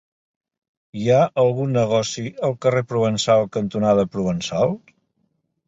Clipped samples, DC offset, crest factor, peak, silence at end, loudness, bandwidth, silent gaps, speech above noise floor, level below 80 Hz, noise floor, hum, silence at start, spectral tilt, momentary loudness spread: under 0.1%; under 0.1%; 16 dB; -4 dBFS; 0.9 s; -20 LUFS; 8.2 kHz; none; 50 dB; -54 dBFS; -70 dBFS; none; 0.95 s; -6 dB/octave; 7 LU